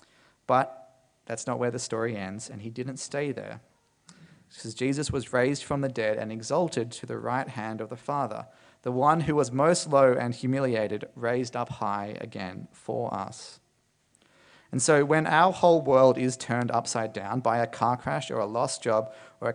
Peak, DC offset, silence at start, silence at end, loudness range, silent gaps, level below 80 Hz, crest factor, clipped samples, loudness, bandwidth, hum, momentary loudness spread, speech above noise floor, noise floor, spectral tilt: -6 dBFS; under 0.1%; 0.5 s; 0 s; 10 LU; none; -62 dBFS; 22 dB; under 0.1%; -27 LUFS; 10.5 kHz; none; 16 LU; 43 dB; -70 dBFS; -5 dB/octave